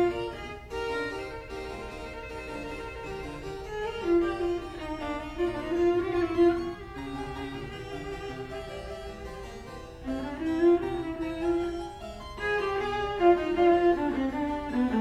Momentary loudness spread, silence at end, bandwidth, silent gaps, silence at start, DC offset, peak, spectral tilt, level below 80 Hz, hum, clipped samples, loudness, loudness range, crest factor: 15 LU; 0 s; 11 kHz; none; 0 s; under 0.1%; -10 dBFS; -6.5 dB/octave; -46 dBFS; none; under 0.1%; -30 LUFS; 10 LU; 20 dB